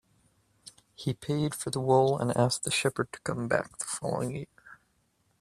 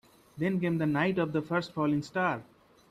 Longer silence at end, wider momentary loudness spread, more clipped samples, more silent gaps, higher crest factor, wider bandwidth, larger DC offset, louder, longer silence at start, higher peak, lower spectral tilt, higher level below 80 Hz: first, 0.65 s vs 0.45 s; first, 12 LU vs 4 LU; neither; neither; first, 22 dB vs 16 dB; first, 14.5 kHz vs 13 kHz; neither; about the same, -29 LUFS vs -30 LUFS; first, 0.65 s vs 0.35 s; first, -8 dBFS vs -16 dBFS; second, -4.5 dB/octave vs -7.5 dB/octave; about the same, -64 dBFS vs -66 dBFS